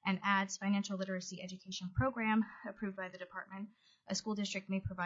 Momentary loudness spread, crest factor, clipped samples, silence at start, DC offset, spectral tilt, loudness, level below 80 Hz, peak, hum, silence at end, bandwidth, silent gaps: 13 LU; 18 dB; under 0.1%; 0.05 s; under 0.1%; -4 dB/octave; -38 LUFS; -64 dBFS; -20 dBFS; none; 0 s; 7.6 kHz; none